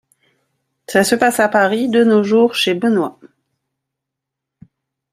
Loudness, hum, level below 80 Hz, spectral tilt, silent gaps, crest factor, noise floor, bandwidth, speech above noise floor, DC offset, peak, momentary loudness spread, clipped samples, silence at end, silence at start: -14 LUFS; none; -60 dBFS; -4 dB/octave; none; 16 dB; -81 dBFS; 15.5 kHz; 67 dB; under 0.1%; 0 dBFS; 5 LU; under 0.1%; 2 s; 0.9 s